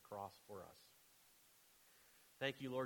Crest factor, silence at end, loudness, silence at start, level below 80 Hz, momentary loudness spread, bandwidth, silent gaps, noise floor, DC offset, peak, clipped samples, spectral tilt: 24 dB; 0 s; -49 LUFS; 0 s; -86 dBFS; 22 LU; 19 kHz; none; -71 dBFS; under 0.1%; -28 dBFS; under 0.1%; -4.5 dB/octave